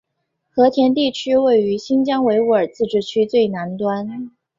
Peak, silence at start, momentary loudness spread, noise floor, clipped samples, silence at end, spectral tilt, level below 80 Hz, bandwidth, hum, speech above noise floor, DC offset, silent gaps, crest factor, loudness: -2 dBFS; 0.55 s; 8 LU; -73 dBFS; under 0.1%; 0.3 s; -6 dB/octave; -60 dBFS; 7.6 kHz; none; 57 dB; under 0.1%; none; 14 dB; -17 LUFS